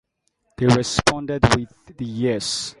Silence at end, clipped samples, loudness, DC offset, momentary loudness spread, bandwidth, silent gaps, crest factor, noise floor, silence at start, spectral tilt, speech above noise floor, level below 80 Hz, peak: 0.1 s; under 0.1%; -20 LUFS; under 0.1%; 13 LU; 11.5 kHz; none; 22 dB; -70 dBFS; 0.6 s; -4.5 dB/octave; 49 dB; -38 dBFS; 0 dBFS